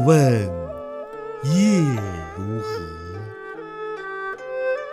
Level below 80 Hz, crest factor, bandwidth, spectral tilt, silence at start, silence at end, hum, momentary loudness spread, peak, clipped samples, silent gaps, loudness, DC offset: -50 dBFS; 20 dB; 14 kHz; -7 dB/octave; 0 s; 0 s; none; 17 LU; -2 dBFS; under 0.1%; none; -23 LUFS; under 0.1%